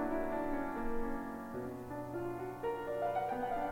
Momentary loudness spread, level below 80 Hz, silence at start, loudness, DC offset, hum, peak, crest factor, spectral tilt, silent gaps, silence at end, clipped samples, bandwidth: 7 LU; -50 dBFS; 0 s; -39 LUFS; under 0.1%; none; -24 dBFS; 12 dB; -7 dB/octave; none; 0 s; under 0.1%; 16.5 kHz